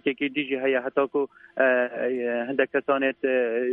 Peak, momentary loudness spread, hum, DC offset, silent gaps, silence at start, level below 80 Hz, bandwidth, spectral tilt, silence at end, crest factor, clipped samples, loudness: -6 dBFS; 5 LU; none; under 0.1%; none; 0.05 s; -76 dBFS; 4 kHz; -7.5 dB/octave; 0 s; 18 dB; under 0.1%; -25 LUFS